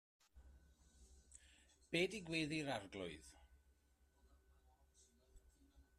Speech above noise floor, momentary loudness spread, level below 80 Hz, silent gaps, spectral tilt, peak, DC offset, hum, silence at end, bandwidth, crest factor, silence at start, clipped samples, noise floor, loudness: 32 dB; 23 LU; -70 dBFS; none; -4.5 dB/octave; -28 dBFS; under 0.1%; none; 0.15 s; 13.5 kHz; 22 dB; 0.35 s; under 0.1%; -76 dBFS; -44 LUFS